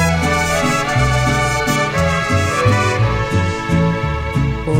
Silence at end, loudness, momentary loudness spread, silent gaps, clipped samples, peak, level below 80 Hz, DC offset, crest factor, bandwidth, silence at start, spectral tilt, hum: 0 s; -16 LUFS; 4 LU; none; under 0.1%; -4 dBFS; -28 dBFS; 0.2%; 12 dB; 16.5 kHz; 0 s; -5 dB/octave; none